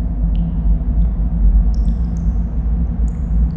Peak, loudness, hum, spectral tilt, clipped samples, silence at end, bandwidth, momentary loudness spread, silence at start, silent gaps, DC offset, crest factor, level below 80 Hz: -4 dBFS; -19 LUFS; none; -10.5 dB/octave; under 0.1%; 0 s; 1.8 kHz; 4 LU; 0 s; none; under 0.1%; 12 dB; -16 dBFS